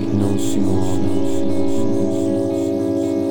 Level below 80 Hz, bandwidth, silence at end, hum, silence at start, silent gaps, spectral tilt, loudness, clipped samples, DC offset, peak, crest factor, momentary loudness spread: -46 dBFS; 17.5 kHz; 0 s; none; 0 s; none; -7 dB/octave; -20 LUFS; under 0.1%; 10%; -4 dBFS; 12 dB; 1 LU